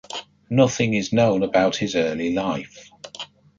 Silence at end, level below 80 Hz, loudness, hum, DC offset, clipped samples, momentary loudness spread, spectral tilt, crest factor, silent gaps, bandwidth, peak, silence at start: 0.35 s; -54 dBFS; -21 LUFS; none; under 0.1%; under 0.1%; 18 LU; -5.5 dB/octave; 18 dB; none; 7.6 kHz; -4 dBFS; 0.1 s